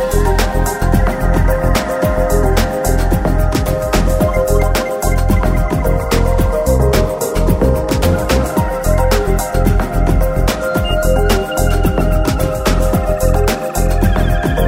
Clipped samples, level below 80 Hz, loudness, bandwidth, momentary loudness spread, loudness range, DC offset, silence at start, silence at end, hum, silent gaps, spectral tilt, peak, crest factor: under 0.1%; -16 dBFS; -15 LUFS; 16.5 kHz; 3 LU; 1 LU; under 0.1%; 0 s; 0 s; none; none; -6 dB/octave; 0 dBFS; 12 dB